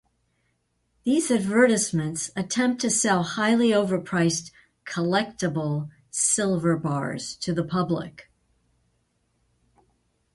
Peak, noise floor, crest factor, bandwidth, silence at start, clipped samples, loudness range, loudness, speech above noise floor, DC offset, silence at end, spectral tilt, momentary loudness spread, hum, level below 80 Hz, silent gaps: -6 dBFS; -72 dBFS; 18 dB; 11.5 kHz; 1.05 s; under 0.1%; 7 LU; -24 LUFS; 48 dB; under 0.1%; 2.1 s; -4.5 dB/octave; 11 LU; none; -60 dBFS; none